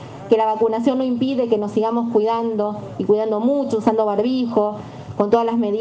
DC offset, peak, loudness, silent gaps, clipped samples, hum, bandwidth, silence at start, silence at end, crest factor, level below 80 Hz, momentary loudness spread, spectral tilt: under 0.1%; -4 dBFS; -19 LUFS; none; under 0.1%; none; 8.4 kHz; 0 s; 0 s; 16 dB; -60 dBFS; 6 LU; -7.5 dB/octave